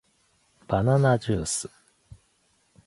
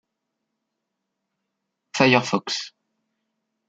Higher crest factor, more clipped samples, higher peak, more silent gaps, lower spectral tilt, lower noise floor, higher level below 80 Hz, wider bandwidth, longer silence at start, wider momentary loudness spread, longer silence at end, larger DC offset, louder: second, 20 dB vs 26 dB; neither; second, -8 dBFS vs -2 dBFS; neither; about the same, -5.5 dB/octave vs -4.5 dB/octave; second, -67 dBFS vs -80 dBFS; first, -50 dBFS vs -68 dBFS; first, 11.5 kHz vs 9 kHz; second, 0.7 s vs 1.95 s; second, 9 LU vs 16 LU; first, 1.2 s vs 1 s; neither; second, -24 LUFS vs -20 LUFS